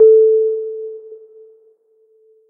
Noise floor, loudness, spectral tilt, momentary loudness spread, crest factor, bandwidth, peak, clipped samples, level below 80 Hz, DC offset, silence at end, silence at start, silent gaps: -55 dBFS; -14 LUFS; -11 dB/octave; 22 LU; 14 dB; 1.4 kHz; -2 dBFS; under 0.1%; -74 dBFS; under 0.1%; 1.35 s; 0 s; none